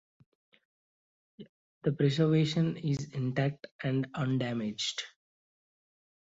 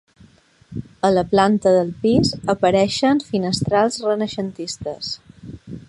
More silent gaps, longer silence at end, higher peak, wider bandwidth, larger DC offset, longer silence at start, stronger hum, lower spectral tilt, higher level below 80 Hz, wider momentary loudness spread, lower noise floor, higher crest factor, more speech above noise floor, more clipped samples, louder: first, 1.49-1.81 s, 3.71-3.79 s vs none; first, 1.25 s vs 0.05 s; second, -14 dBFS vs -2 dBFS; second, 8 kHz vs 11.5 kHz; neither; first, 1.4 s vs 0.7 s; neither; about the same, -6 dB/octave vs -5.5 dB/octave; second, -68 dBFS vs -48 dBFS; second, 8 LU vs 18 LU; first, under -90 dBFS vs -51 dBFS; about the same, 18 dB vs 18 dB; first, over 60 dB vs 33 dB; neither; second, -31 LUFS vs -19 LUFS